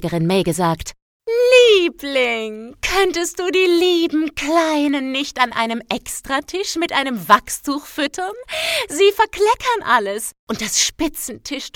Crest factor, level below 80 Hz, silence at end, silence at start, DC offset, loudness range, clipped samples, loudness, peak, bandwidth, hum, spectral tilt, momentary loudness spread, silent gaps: 18 dB; -46 dBFS; 0.05 s; 0 s; under 0.1%; 4 LU; under 0.1%; -18 LUFS; 0 dBFS; 18 kHz; none; -3 dB/octave; 10 LU; 1.02-1.20 s, 10.39-10.47 s